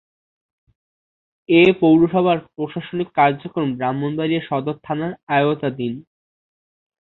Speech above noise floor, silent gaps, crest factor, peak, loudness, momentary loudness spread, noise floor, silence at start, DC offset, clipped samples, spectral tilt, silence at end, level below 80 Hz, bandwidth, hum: over 72 dB; 5.23-5.27 s; 18 dB; -2 dBFS; -19 LUFS; 13 LU; under -90 dBFS; 1.5 s; under 0.1%; under 0.1%; -9 dB/octave; 1 s; -58 dBFS; 4.2 kHz; none